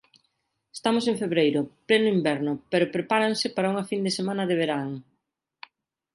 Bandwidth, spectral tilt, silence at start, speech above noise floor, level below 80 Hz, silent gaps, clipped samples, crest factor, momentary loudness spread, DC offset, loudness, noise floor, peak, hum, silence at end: 11.5 kHz; -5 dB/octave; 0.75 s; 53 dB; -70 dBFS; none; under 0.1%; 18 dB; 7 LU; under 0.1%; -25 LUFS; -78 dBFS; -8 dBFS; none; 1.15 s